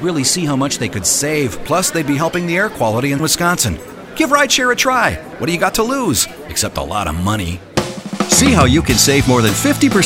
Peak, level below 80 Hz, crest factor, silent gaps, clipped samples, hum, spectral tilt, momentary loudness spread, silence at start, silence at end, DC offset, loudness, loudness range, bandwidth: 0 dBFS; -36 dBFS; 16 dB; none; under 0.1%; none; -3.5 dB/octave; 9 LU; 0 s; 0 s; under 0.1%; -14 LUFS; 3 LU; 16 kHz